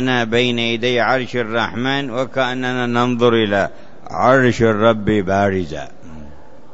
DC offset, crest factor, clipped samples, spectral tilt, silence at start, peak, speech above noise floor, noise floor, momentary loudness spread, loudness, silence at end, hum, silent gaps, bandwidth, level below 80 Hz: 3%; 16 dB; under 0.1%; -6 dB/octave; 0 s; 0 dBFS; 25 dB; -41 dBFS; 8 LU; -17 LUFS; 0.4 s; none; none; 8 kHz; -46 dBFS